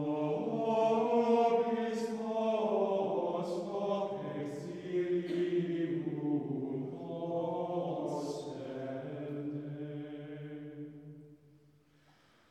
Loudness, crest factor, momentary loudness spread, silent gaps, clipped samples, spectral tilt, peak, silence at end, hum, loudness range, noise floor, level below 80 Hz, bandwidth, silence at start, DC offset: -35 LUFS; 16 dB; 15 LU; none; under 0.1%; -7.5 dB/octave; -18 dBFS; 1.15 s; none; 12 LU; -66 dBFS; -84 dBFS; 11.5 kHz; 0 s; under 0.1%